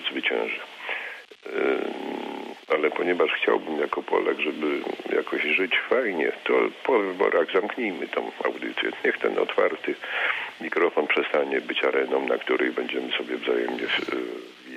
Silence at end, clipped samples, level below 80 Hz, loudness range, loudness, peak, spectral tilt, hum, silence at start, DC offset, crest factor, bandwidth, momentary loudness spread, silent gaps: 0 s; under 0.1%; -76 dBFS; 2 LU; -25 LUFS; -10 dBFS; -4.5 dB/octave; none; 0 s; under 0.1%; 16 dB; 12.5 kHz; 9 LU; none